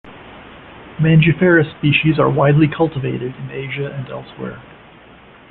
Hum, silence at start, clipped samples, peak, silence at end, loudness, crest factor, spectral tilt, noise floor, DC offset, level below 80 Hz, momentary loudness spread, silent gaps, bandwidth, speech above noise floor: none; 0.05 s; under 0.1%; -2 dBFS; 0.9 s; -15 LUFS; 16 dB; -11.5 dB/octave; -43 dBFS; under 0.1%; -46 dBFS; 18 LU; none; 4.2 kHz; 28 dB